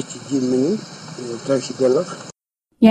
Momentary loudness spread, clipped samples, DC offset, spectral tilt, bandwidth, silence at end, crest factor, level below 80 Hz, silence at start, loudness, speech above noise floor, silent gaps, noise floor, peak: 15 LU; under 0.1%; under 0.1%; -5.5 dB/octave; 10 kHz; 0 s; 20 dB; -64 dBFS; 0 s; -21 LUFS; 47 dB; none; -67 dBFS; 0 dBFS